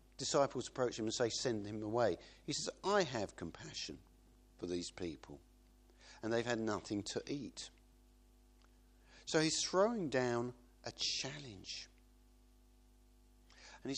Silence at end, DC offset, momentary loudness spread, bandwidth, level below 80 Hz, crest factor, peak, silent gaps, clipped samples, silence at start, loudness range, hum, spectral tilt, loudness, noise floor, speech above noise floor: 0 s; under 0.1%; 17 LU; 11 kHz; -66 dBFS; 22 dB; -18 dBFS; none; under 0.1%; 0.2 s; 7 LU; 50 Hz at -65 dBFS; -3.5 dB/octave; -39 LUFS; -66 dBFS; 27 dB